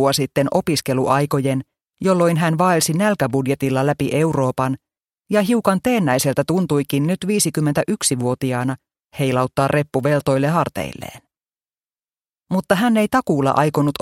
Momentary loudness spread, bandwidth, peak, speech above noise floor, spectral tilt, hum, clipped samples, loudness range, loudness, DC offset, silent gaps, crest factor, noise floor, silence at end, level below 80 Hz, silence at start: 7 LU; 16.5 kHz; 0 dBFS; over 72 dB; -5.5 dB/octave; none; under 0.1%; 3 LU; -19 LUFS; under 0.1%; 12.29-12.33 s; 18 dB; under -90 dBFS; 0.1 s; -52 dBFS; 0 s